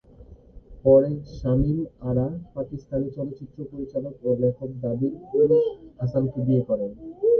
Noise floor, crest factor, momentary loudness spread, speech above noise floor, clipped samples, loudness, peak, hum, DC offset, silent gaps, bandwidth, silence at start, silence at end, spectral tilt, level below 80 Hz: -48 dBFS; 20 dB; 15 LU; 24 dB; under 0.1%; -25 LUFS; -4 dBFS; none; under 0.1%; none; 6.4 kHz; 0.2 s; 0 s; -11.5 dB/octave; -44 dBFS